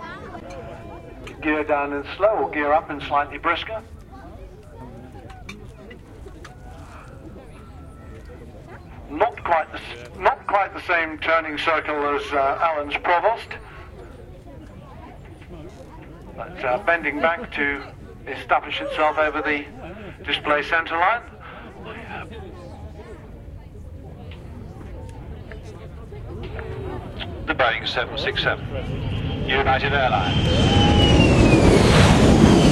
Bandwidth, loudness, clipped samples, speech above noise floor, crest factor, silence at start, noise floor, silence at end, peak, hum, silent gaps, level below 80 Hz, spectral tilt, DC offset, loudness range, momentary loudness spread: 13 kHz; -20 LUFS; under 0.1%; 19 dB; 22 dB; 0 s; -41 dBFS; 0 s; 0 dBFS; none; none; -34 dBFS; -5.5 dB/octave; under 0.1%; 19 LU; 26 LU